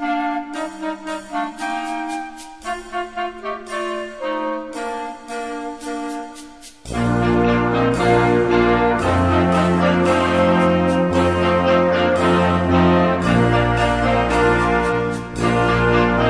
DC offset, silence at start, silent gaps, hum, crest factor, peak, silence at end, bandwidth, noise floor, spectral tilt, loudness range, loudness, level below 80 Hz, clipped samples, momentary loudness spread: 0.3%; 0 s; none; none; 14 dB; -4 dBFS; 0 s; 11 kHz; -39 dBFS; -6.5 dB/octave; 10 LU; -18 LUFS; -34 dBFS; under 0.1%; 13 LU